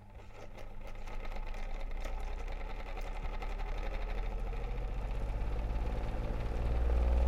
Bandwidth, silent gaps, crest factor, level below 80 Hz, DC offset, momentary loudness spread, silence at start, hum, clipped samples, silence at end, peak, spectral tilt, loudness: 7.6 kHz; none; 16 dB; -36 dBFS; under 0.1%; 13 LU; 0 s; none; under 0.1%; 0 s; -20 dBFS; -7 dB/octave; -41 LUFS